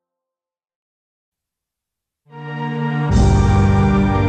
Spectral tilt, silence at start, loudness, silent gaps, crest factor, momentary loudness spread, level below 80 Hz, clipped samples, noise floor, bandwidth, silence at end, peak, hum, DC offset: -7.5 dB/octave; 2.35 s; -16 LUFS; none; 14 dB; 14 LU; -24 dBFS; under 0.1%; -86 dBFS; 8.8 kHz; 0 s; -4 dBFS; none; under 0.1%